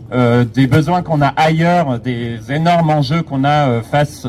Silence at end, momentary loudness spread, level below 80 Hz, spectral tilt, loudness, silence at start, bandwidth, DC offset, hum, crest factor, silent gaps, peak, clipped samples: 0 s; 6 LU; -42 dBFS; -7 dB/octave; -14 LUFS; 0 s; 13.5 kHz; under 0.1%; none; 12 dB; none; -2 dBFS; under 0.1%